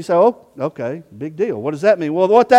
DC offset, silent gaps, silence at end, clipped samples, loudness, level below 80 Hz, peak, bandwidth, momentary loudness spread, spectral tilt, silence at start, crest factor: under 0.1%; none; 0 s; under 0.1%; -18 LUFS; -64 dBFS; 0 dBFS; 11 kHz; 13 LU; -6.5 dB/octave; 0 s; 16 dB